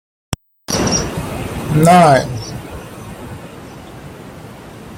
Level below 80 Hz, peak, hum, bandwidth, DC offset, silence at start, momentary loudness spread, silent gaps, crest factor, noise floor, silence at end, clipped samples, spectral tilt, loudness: -38 dBFS; 0 dBFS; none; 16.5 kHz; under 0.1%; 0.3 s; 25 LU; none; 18 dB; -34 dBFS; 0 s; under 0.1%; -5 dB/octave; -14 LUFS